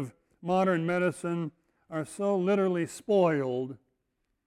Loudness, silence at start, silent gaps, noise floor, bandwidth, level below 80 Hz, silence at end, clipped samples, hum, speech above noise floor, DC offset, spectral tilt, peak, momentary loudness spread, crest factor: -29 LUFS; 0 s; none; -79 dBFS; 13.5 kHz; -70 dBFS; 0.7 s; under 0.1%; none; 51 dB; under 0.1%; -7 dB/octave; -14 dBFS; 14 LU; 16 dB